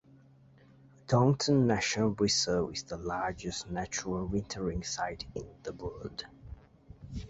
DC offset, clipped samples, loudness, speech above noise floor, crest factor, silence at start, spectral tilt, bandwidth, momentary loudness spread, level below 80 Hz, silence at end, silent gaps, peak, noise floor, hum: under 0.1%; under 0.1%; -32 LUFS; 28 dB; 20 dB; 1.1 s; -4.5 dB/octave; 8.2 kHz; 17 LU; -52 dBFS; 0 s; none; -14 dBFS; -59 dBFS; none